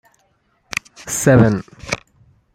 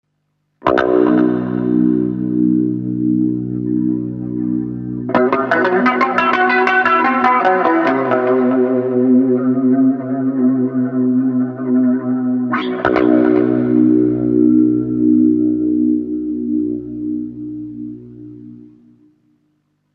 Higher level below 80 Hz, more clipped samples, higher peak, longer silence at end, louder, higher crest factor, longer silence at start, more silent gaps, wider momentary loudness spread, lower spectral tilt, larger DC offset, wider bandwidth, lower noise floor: first, -44 dBFS vs -50 dBFS; neither; about the same, 0 dBFS vs 0 dBFS; second, 0.6 s vs 1.3 s; second, -18 LUFS vs -15 LUFS; about the same, 18 dB vs 14 dB; first, 1 s vs 0.65 s; neither; first, 14 LU vs 10 LU; second, -5.5 dB/octave vs -8.5 dB/octave; neither; first, 16 kHz vs 5.6 kHz; second, -62 dBFS vs -68 dBFS